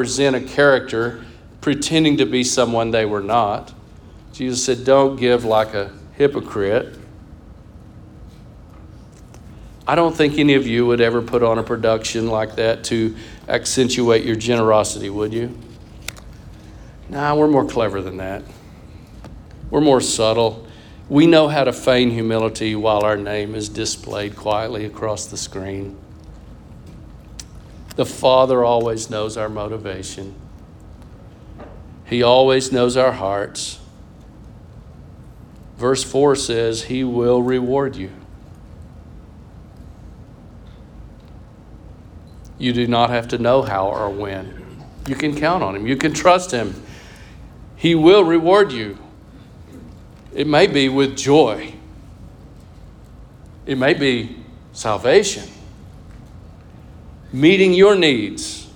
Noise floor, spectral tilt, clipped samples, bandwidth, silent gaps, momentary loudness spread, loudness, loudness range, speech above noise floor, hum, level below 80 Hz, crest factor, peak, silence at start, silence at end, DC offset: -41 dBFS; -4.5 dB/octave; under 0.1%; 18.5 kHz; none; 19 LU; -17 LUFS; 8 LU; 25 dB; none; -44 dBFS; 18 dB; -2 dBFS; 0 s; 0.05 s; under 0.1%